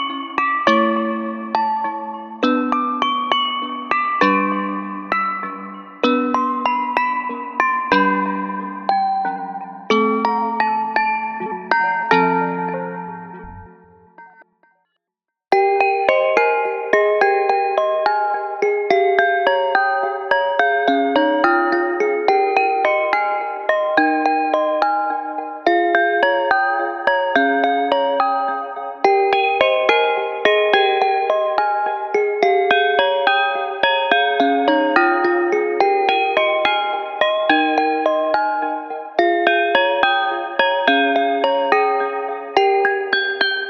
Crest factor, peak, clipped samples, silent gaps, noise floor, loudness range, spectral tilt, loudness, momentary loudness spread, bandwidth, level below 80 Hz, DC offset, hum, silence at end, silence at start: 18 dB; 0 dBFS; under 0.1%; none; -83 dBFS; 4 LU; -5 dB/octave; -18 LUFS; 8 LU; 6.8 kHz; -62 dBFS; under 0.1%; none; 0 s; 0 s